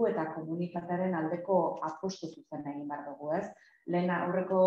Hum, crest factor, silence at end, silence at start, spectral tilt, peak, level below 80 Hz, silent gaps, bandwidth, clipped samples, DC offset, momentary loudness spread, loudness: none; 18 dB; 0 s; 0 s; -7.5 dB/octave; -14 dBFS; -78 dBFS; none; 7.4 kHz; under 0.1%; under 0.1%; 12 LU; -34 LUFS